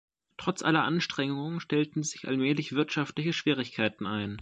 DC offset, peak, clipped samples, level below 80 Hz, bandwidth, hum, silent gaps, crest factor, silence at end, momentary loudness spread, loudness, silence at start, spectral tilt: under 0.1%; -10 dBFS; under 0.1%; -66 dBFS; 9.2 kHz; none; none; 20 dB; 0 s; 7 LU; -30 LUFS; 0.4 s; -5 dB/octave